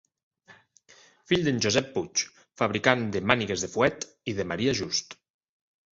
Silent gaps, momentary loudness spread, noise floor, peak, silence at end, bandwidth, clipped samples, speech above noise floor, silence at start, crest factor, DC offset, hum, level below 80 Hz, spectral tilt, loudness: none; 9 LU; -58 dBFS; -2 dBFS; 0.8 s; 8 kHz; under 0.1%; 31 dB; 0.5 s; 26 dB; under 0.1%; none; -58 dBFS; -3.5 dB/octave; -27 LUFS